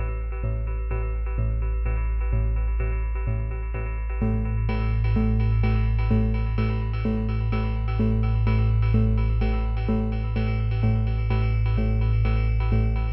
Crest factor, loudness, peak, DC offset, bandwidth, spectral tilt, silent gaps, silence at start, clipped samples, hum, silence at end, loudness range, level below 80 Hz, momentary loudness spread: 14 dB; -25 LUFS; -10 dBFS; under 0.1%; 5.6 kHz; -11 dB/octave; none; 0 s; under 0.1%; none; 0 s; 4 LU; -24 dBFS; 6 LU